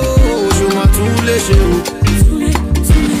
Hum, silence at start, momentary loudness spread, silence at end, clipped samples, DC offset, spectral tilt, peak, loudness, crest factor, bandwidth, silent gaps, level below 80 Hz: none; 0 s; 3 LU; 0 s; under 0.1%; under 0.1%; -5.5 dB/octave; 0 dBFS; -12 LUFS; 10 dB; 16 kHz; none; -14 dBFS